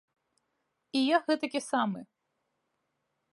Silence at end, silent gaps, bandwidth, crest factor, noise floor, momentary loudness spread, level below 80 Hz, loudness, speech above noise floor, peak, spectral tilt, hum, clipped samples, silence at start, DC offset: 1.3 s; none; 11.5 kHz; 22 dB; -81 dBFS; 8 LU; -86 dBFS; -30 LUFS; 52 dB; -12 dBFS; -4.5 dB/octave; none; under 0.1%; 0.95 s; under 0.1%